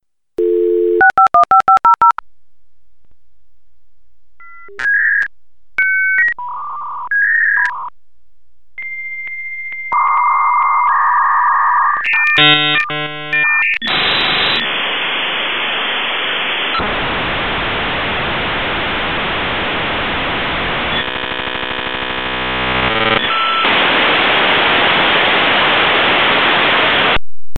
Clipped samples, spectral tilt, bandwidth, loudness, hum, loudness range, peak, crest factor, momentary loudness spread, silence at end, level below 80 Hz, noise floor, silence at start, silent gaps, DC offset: under 0.1%; -5 dB/octave; 16.5 kHz; -13 LUFS; none; 7 LU; 0 dBFS; 14 dB; 10 LU; 0 s; -38 dBFS; -60 dBFS; 0 s; none; 2%